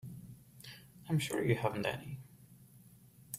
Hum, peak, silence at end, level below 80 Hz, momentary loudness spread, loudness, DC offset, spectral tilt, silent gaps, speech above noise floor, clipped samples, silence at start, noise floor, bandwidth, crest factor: none; -18 dBFS; 0 s; -68 dBFS; 20 LU; -36 LUFS; under 0.1%; -5.5 dB/octave; none; 26 dB; under 0.1%; 0.05 s; -60 dBFS; 16 kHz; 22 dB